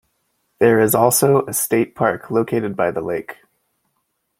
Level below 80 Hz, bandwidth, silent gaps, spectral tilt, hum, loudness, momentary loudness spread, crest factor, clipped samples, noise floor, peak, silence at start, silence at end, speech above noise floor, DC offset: -58 dBFS; 16.5 kHz; none; -5 dB/octave; none; -17 LUFS; 11 LU; 18 dB; under 0.1%; -71 dBFS; -2 dBFS; 0.6 s; 1.05 s; 54 dB; under 0.1%